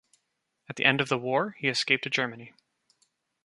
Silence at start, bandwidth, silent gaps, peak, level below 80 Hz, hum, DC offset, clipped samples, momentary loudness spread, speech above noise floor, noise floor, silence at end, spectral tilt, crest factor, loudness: 0.7 s; 11.5 kHz; none; -4 dBFS; -74 dBFS; none; under 0.1%; under 0.1%; 11 LU; 51 dB; -79 dBFS; 0.95 s; -4 dB/octave; 26 dB; -26 LUFS